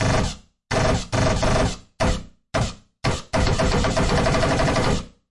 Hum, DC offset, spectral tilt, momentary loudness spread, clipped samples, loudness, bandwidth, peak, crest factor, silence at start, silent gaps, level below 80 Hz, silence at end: none; under 0.1%; -5 dB/octave; 8 LU; under 0.1%; -22 LUFS; 11.5 kHz; -6 dBFS; 16 dB; 0 s; none; -30 dBFS; 0.2 s